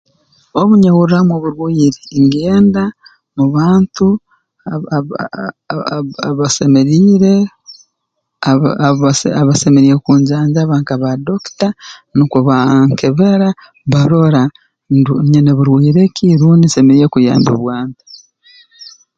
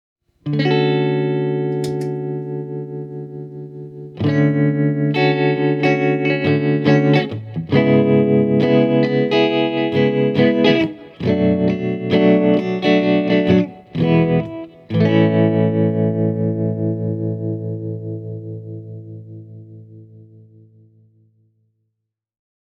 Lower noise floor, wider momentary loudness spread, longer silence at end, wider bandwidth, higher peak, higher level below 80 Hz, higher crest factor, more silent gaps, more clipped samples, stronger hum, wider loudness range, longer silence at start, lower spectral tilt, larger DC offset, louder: second, -71 dBFS vs -77 dBFS; second, 12 LU vs 16 LU; second, 0.35 s vs 2.4 s; first, 9.2 kHz vs 7.4 kHz; about the same, 0 dBFS vs 0 dBFS; first, -46 dBFS vs -56 dBFS; second, 12 dB vs 18 dB; neither; neither; neither; second, 4 LU vs 10 LU; about the same, 0.55 s vs 0.45 s; second, -7 dB/octave vs -8.5 dB/octave; neither; first, -11 LUFS vs -17 LUFS